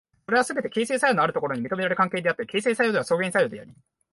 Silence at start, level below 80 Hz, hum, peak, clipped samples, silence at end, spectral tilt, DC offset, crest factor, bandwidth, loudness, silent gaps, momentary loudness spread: 0.3 s; -68 dBFS; none; -8 dBFS; under 0.1%; 0.4 s; -4.5 dB/octave; under 0.1%; 16 dB; 11.5 kHz; -24 LUFS; none; 6 LU